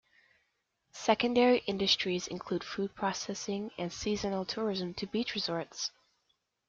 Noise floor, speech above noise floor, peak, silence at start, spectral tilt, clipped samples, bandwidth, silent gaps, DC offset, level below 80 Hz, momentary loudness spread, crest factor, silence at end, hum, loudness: -79 dBFS; 47 dB; -12 dBFS; 0.95 s; -4 dB/octave; under 0.1%; 7.6 kHz; none; under 0.1%; -64 dBFS; 10 LU; 22 dB; 0.8 s; none; -32 LUFS